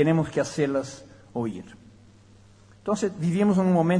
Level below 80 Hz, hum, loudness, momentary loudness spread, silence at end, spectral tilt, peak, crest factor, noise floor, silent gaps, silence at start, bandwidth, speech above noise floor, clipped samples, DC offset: -60 dBFS; none; -26 LUFS; 18 LU; 0 s; -7 dB/octave; -8 dBFS; 16 dB; -53 dBFS; none; 0 s; 10.5 kHz; 29 dB; under 0.1%; under 0.1%